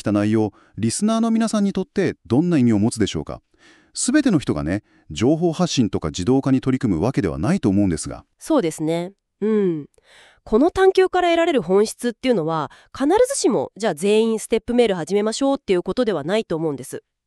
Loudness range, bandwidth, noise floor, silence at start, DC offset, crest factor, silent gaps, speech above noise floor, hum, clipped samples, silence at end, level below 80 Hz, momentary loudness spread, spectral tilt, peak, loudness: 2 LU; 13 kHz; -52 dBFS; 0.05 s; under 0.1%; 16 dB; none; 33 dB; none; under 0.1%; 0.3 s; -46 dBFS; 9 LU; -5.5 dB/octave; -4 dBFS; -20 LUFS